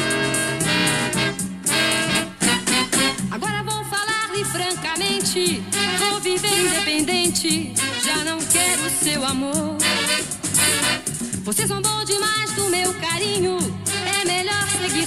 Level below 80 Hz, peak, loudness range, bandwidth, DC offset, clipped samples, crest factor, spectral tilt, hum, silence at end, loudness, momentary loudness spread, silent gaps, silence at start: -52 dBFS; -4 dBFS; 2 LU; 16 kHz; under 0.1%; under 0.1%; 18 dB; -2 dB/octave; none; 0 s; -20 LUFS; 5 LU; none; 0 s